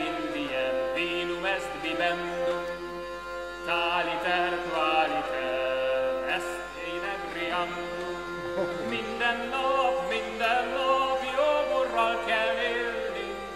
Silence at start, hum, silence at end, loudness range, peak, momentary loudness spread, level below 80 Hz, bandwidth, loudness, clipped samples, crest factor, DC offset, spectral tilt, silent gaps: 0 s; none; 0 s; 4 LU; -12 dBFS; 9 LU; -54 dBFS; 13.5 kHz; -28 LUFS; under 0.1%; 16 dB; under 0.1%; -3.5 dB/octave; none